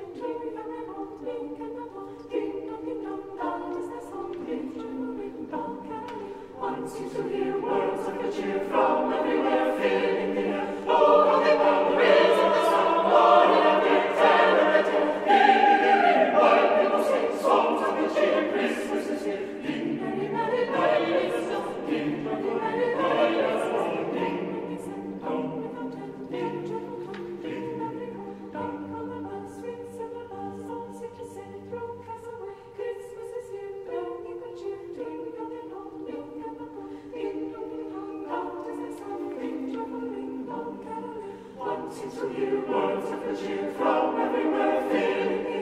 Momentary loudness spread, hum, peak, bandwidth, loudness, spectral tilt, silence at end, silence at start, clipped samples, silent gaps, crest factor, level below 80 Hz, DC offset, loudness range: 18 LU; none; -6 dBFS; 13.5 kHz; -26 LUFS; -5.5 dB/octave; 0 s; 0 s; under 0.1%; none; 20 dB; -64 dBFS; under 0.1%; 17 LU